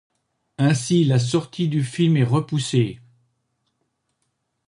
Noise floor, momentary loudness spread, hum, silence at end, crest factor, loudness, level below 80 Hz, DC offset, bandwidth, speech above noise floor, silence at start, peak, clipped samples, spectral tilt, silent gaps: -74 dBFS; 5 LU; none; 1.7 s; 16 dB; -21 LUFS; -60 dBFS; under 0.1%; 11 kHz; 54 dB; 0.6 s; -6 dBFS; under 0.1%; -6 dB/octave; none